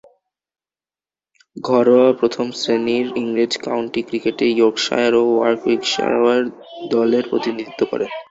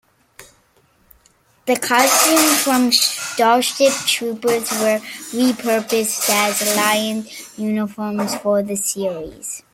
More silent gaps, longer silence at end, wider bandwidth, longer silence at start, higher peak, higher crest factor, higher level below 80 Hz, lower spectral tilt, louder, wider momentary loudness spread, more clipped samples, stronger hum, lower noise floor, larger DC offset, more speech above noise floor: neither; about the same, 0.05 s vs 0.15 s; second, 8 kHz vs 16.5 kHz; first, 1.55 s vs 0.4 s; about the same, -2 dBFS vs -2 dBFS; about the same, 16 dB vs 18 dB; about the same, -62 dBFS vs -60 dBFS; first, -4.5 dB/octave vs -2 dB/octave; about the same, -18 LUFS vs -17 LUFS; second, 9 LU vs 12 LU; neither; neither; first, under -90 dBFS vs -57 dBFS; neither; first, over 73 dB vs 39 dB